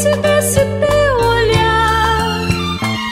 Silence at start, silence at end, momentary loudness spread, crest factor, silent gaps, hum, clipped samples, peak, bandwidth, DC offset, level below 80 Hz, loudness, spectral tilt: 0 s; 0 s; 5 LU; 14 dB; none; none; under 0.1%; 0 dBFS; 16 kHz; under 0.1%; -28 dBFS; -14 LUFS; -4.5 dB/octave